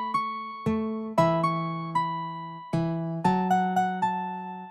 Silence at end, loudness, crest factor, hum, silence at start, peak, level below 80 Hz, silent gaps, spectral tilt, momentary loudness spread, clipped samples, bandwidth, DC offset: 0 s; -28 LUFS; 18 dB; none; 0 s; -10 dBFS; -60 dBFS; none; -7.5 dB/octave; 9 LU; under 0.1%; 13.5 kHz; under 0.1%